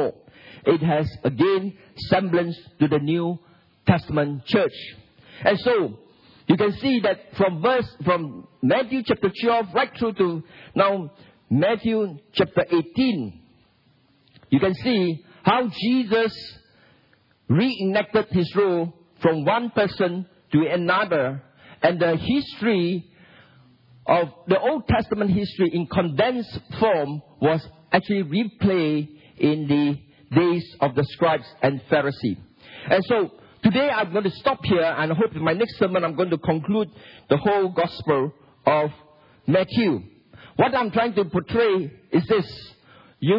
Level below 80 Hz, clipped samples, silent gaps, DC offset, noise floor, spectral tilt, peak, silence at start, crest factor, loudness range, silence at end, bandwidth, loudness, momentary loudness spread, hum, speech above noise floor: -54 dBFS; under 0.1%; none; under 0.1%; -60 dBFS; -9 dB/octave; -2 dBFS; 0 s; 22 dB; 2 LU; 0 s; 5.8 kHz; -22 LUFS; 8 LU; none; 39 dB